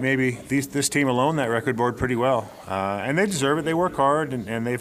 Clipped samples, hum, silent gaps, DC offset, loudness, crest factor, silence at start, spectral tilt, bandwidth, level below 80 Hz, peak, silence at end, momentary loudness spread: under 0.1%; none; none; under 0.1%; -23 LUFS; 16 dB; 0 s; -5 dB/octave; 15.5 kHz; -52 dBFS; -8 dBFS; 0 s; 6 LU